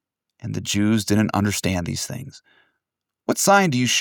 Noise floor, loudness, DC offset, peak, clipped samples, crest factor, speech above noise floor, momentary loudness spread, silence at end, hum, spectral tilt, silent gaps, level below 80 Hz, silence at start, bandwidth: -83 dBFS; -20 LUFS; under 0.1%; -4 dBFS; under 0.1%; 18 dB; 62 dB; 17 LU; 0 s; none; -4 dB/octave; none; -54 dBFS; 0.45 s; 19 kHz